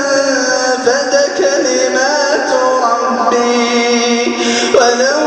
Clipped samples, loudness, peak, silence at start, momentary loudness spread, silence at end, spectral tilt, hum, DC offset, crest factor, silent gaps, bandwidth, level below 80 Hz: under 0.1%; -12 LUFS; 0 dBFS; 0 s; 3 LU; 0 s; -1.5 dB/octave; none; under 0.1%; 12 dB; none; 9.8 kHz; -56 dBFS